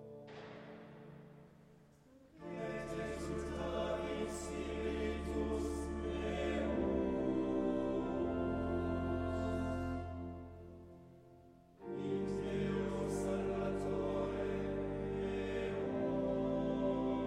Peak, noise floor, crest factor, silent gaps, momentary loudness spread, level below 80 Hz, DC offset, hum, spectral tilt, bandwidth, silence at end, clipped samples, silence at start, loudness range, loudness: -24 dBFS; -64 dBFS; 14 dB; none; 16 LU; -52 dBFS; under 0.1%; none; -7 dB/octave; 13.5 kHz; 0 s; under 0.1%; 0 s; 6 LU; -39 LUFS